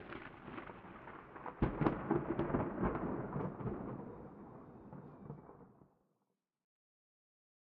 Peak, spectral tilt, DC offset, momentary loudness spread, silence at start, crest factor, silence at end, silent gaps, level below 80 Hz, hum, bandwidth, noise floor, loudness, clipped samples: -16 dBFS; -8 dB/octave; under 0.1%; 18 LU; 0 s; 26 dB; 1.95 s; none; -56 dBFS; none; 5.2 kHz; -86 dBFS; -41 LUFS; under 0.1%